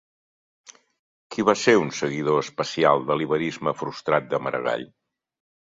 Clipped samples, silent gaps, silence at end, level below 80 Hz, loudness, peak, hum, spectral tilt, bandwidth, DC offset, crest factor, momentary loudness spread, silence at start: under 0.1%; none; 0.9 s; -66 dBFS; -23 LUFS; -4 dBFS; none; -5 dB/octave; 7.8 kHz; under 0.1%; 22 dB; 9 LU; 1.3 s